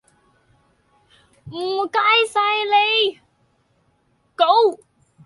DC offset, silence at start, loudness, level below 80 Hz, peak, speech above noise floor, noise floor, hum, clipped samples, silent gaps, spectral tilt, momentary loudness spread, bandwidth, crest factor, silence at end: under 0.1%; 1.45 s; -17 LUFS; -68 dBFS; -2 dBFS; 45 dB; -63 dBFS; none; under 0.1%; none; -2.5 dB/octave; 16 LU; 11.5 kHz; 18 dB; 0.5 s